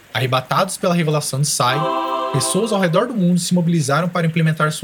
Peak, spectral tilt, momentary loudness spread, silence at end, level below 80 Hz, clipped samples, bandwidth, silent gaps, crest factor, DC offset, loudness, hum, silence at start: 0 dBFS; -5 dB/octave; 2 LU; 0 s; -62 dBFS; under 0.1%; 18.5 kHz; none; 18 dB; under 0.1%; -18 LUFS; none; 0.15 s